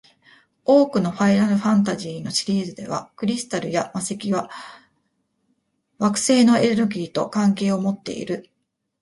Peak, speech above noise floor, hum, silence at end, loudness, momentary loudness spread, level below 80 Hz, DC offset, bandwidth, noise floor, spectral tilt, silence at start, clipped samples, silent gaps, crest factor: -4 dBFS; 50 dB; none; 0.6 s; -21 LUFS; 13 LU; -62 dBFS; under 0.1%; 11.5 kHz; -71 dBFS; -5 dB/octave; 0.7 s; under 0.1%; none; 18 dB